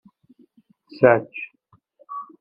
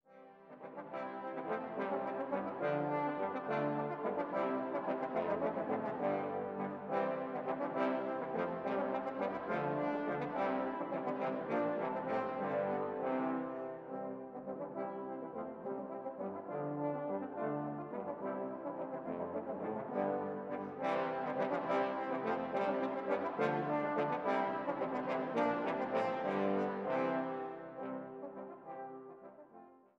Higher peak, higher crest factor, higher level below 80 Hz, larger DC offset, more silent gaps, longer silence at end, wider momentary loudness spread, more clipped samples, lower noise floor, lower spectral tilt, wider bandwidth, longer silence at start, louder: first, 0 dBFS vs -20 dBFS; first, 24 dB vs 18 dB; first, -66 dBFS vs -78 dBFS; neither; neither; about the same, 0.2 s vs 0.2 s; first, 20 LU vs 9 LU; neither; about the same, -62 dBFS vs -60 dBFS; first, -10 dB/octave vs -8 dB/octave; second, 5.4 kHz vs 7.6 kHz; first, 1 s vs 0.1 s; first, -18 LUFS vs -38 LUFS